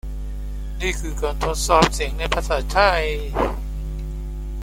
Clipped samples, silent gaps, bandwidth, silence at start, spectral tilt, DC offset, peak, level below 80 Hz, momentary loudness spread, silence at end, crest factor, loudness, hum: under 0.1%; none; 16 kHz; 0.05 s; -4 dB/octave; under 0.1%; -2 dBFS; -26 dBFS; 15 LU; 0 s; 20 dB; -22 LUFS; none